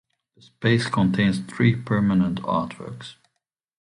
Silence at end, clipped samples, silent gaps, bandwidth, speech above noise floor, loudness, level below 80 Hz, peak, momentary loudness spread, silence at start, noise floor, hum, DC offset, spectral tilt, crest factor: 0.7 s; under 0.1%; none; 11 kHz; 57 dB; -22 LUFS; -52 dBFS; -4 dBFS; 16 LU; 0.6 s; -79 dBFS; none; under 0.1%; -7 dB/octave; 18 dB